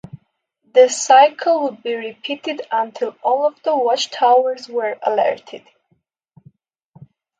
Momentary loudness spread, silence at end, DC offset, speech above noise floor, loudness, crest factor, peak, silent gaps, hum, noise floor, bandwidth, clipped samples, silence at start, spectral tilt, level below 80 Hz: 14 LU; 1.8 s; under 0.1%; 49 dB; -17 LUFS; 18 dB; 0 dBFS; none; none; -66 dBFS; 9.4 kHz; under 0.1%; 0.15 s; -2 dB/octave; -70 dBFS